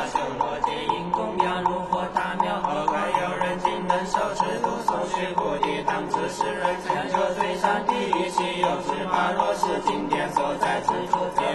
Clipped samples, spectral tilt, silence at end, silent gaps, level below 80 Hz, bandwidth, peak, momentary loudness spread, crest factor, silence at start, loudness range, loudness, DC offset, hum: under 0.1%; -4.5 dB/octave; 0 s; none; -52 dBFS; 12.5 kHz; -6 dBFS; 3 LU; 18 dB; 0 s; 1 LU; -25 LUFS; under 0.1%; none